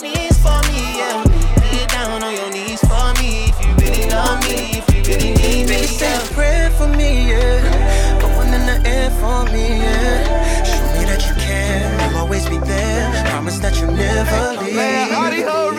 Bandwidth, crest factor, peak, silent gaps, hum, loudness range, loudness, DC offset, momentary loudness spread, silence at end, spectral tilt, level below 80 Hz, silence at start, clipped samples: 17.5 kHz; 12 dB; -2 dBFS; none; none; 2 LU; -17 LUFS; under 0.1%; 3 LU; 0 s; -4.5 dB/octave; -16 dBFS; 0 s; under 0.1%